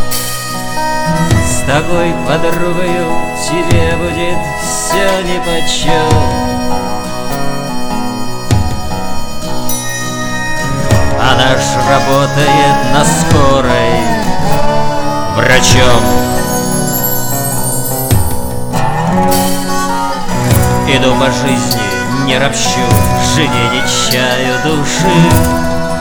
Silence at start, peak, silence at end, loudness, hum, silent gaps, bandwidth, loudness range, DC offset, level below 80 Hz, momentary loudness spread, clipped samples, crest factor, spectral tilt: 0 s; 0 dBFS; 0 s; -12 LUFS; none; none; over 20 kHz; 5 LU; under 0.1%; -24 dBFS; 8 LU; 0.2%; 10 dB; -4.5 dB/octave